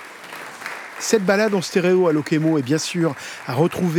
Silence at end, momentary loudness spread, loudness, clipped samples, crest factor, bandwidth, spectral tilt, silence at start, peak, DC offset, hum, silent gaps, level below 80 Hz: 0 s; 15 LU; -20 LUFS; under 0.1%; 18 dB; 18.5 kHz; -5.5 dB/octave; 0 s; -2 dBFS; under 0.1%; none; none; -64 dBFS